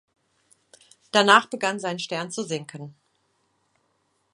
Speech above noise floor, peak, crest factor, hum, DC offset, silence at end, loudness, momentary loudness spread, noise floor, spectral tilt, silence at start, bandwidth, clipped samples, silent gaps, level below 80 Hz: 48 dB; 0 dBFS; 26 dB; none; under 0.1%; 1.45 s; -22 LUFS; 23 LU; -71 dBFS; -3 dB/octave; 1.15 s; 11.5 kHz; under 0.1%; none; -78 dBFS